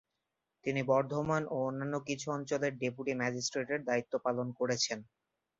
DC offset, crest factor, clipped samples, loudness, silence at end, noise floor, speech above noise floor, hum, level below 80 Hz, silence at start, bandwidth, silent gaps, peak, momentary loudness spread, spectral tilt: under 0.1%; 18 dB; under 0.1%; -34 LUFS; 0.55 s; -86 dBFS; 52 dB; none; -72 dBFS; 0.65 s; 7.6 kHz; none; -16 dBFS; 6 LU; -4 dB/octave